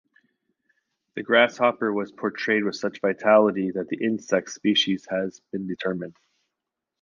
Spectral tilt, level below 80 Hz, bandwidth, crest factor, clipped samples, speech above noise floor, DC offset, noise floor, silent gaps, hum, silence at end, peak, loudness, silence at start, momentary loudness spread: -4.5 dB/octave; -70 dBFS; 7.2 kHz; 22 dB; under 0.1%; 61 dB; under 0.1%; -85 dBFS; none; none; 0.9 s; -4 dBFS; -24 LUFS; 1.15 s; 14 LU